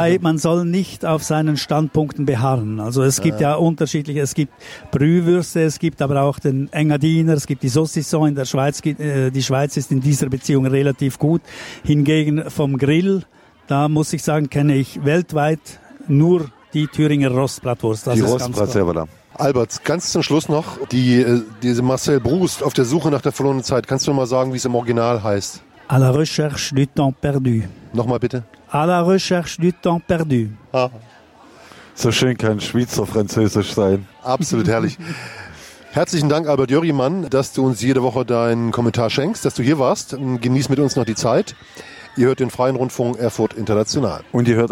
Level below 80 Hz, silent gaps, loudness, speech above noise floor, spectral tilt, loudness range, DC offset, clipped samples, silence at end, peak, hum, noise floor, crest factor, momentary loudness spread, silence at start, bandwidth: -48 dBFS; none; -18 LUFS; 28 dB; -6 dB/octave; 2 LU; under 0.1%; under 0.1%; 0 s; -4 dBFS; none; -46 dBFS; 14 dB; 6 LU; 0 s; 16.5 kHz